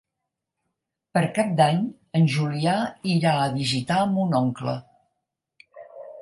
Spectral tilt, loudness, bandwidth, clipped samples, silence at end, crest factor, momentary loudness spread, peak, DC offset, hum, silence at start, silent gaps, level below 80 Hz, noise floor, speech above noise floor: -6 dB/octave; -23 LUFS; 11.5 kHz; under 0.1%; 0 s; 18 dB; 9 LU; -6 dBFS; under 0.1%; none; 1.15 s; none; -64 dBFS; -83 dBFS; 61 dB